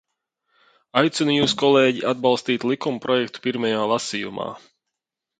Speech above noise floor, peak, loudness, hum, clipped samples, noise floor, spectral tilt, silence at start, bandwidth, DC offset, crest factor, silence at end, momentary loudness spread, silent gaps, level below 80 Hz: 63 dB; -2 dBFS; -21 LUFS; none; under 0.1%; -84 dBFS; -4.5 dB/octave; 0.95 s; 9.4 kHz; under 0.1%; 20 dB; 0.8 s; 10 LU; none; -64 dBFS